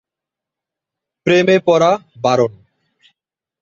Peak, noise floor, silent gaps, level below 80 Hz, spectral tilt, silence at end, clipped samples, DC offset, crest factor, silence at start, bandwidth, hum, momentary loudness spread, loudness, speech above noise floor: 0 dBFS; -85 dBFS; none; -58 dBFS; -5.5 dB/octave; 1.1 s; under 0.1%; under 0.1%; 16 dB; 1.25 s; 7.6 kHz; none; 7 LU; -15 LUFS; 71 dB